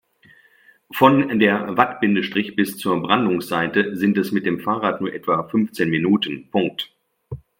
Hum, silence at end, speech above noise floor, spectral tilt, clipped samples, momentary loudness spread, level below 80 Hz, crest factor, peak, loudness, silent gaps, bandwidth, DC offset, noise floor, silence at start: none; 0.2 s; 35 dB; -6 dB/octave; under 0.1%; 8 LU; -60 dBFS; 20 dB; 0 dBFS; -20 LUFS; none; 16.5 kHz; under 0.1%; -55 dBFS; 0.9 s